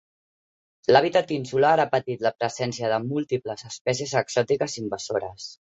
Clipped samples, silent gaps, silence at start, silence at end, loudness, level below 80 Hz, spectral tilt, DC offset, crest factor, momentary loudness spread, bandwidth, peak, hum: under 0.1%; 3.81-3.85 s; 0.9 s; 0.25 s; -24 LUFS; -64 dBFS; -4.5 dB/octave; under 0.1%; 22 dB; 10 LU; 8.2 kHz; -2 dBFS; none